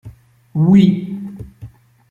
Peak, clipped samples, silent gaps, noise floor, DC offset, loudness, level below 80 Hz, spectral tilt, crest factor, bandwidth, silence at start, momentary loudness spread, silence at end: -2 dBFS; under 0.1%; none; -40 dBFS; under 0.1%; -14 LUFS; -48 dBFS; -9.5 dB/octave; 14 dB; 7 kHz; 0.05 s; 23 LU; 0.45 s